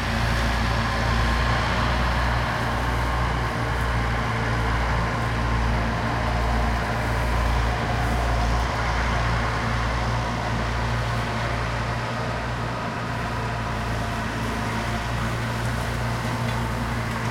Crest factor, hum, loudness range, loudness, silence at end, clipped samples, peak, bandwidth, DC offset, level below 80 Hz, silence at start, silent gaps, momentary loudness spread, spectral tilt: 14 dB; none; 3 LU; -25 LUFS; 0 s; under 0.1%; -10 dBFS; 15.5 kHz; under 0.1%; -28 dBFS; 0 s; none; 4 LU; -5.5 dB/octave